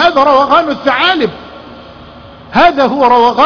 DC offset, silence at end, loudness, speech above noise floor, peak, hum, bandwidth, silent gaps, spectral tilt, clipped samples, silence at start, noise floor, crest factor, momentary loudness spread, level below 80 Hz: under 0.1%; 0 s; -9 LUFS; 25 dB; 0 dBFS; none; 5.4 kHz; none; -5 dB/octave; 0.3%; 0 s; -33 dBFS; 10 dB; 10 LU; -42 dBFS